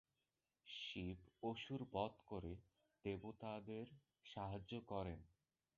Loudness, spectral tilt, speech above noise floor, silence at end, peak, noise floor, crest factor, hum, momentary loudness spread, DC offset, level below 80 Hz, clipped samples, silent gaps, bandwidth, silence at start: -51 LUFS; -4.5 dB/octave; over 40 dB; 0.5 s; -30 dBFS; under -90 dBFS; 22 dB; none; 11 LU; under 0.1%; -68 dBFS; under 0.1%; none; 7 kHz; 0.65 s